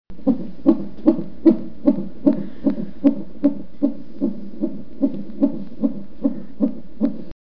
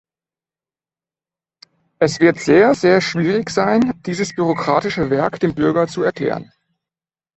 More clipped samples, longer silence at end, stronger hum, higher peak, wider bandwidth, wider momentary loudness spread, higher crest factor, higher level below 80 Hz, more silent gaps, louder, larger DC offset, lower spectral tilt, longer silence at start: neither; second, 0.05 s vs 0.95 s; neither; about the same, 0 dBFS vs 0 dBFS; second, 5.4 kHz vs 8.2 kHz; about the same, 8 LU vs 8 LU; about the same, 20 dB vs 18 dB; about the same, -48 dBFS vs -52 dBFS; neither; second, -22 LUFS vs -17 LUFS; first, 5% vs under 0.1%; first, -11 dB/octave vs -6 dB/octave; second, 0 s vs 2 s